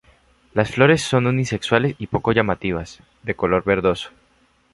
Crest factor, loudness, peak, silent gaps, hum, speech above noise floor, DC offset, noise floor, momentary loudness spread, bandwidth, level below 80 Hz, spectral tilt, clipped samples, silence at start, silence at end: 20 dB; -20 LUFS; -2 dBFS; none; none; 40 dB; under 0.1%; -59 dBFS; 13 LU; 11.5 kHz; -44 dBFS; -6 dB/octave; under 0.1%; 0.55 s; 0.65 s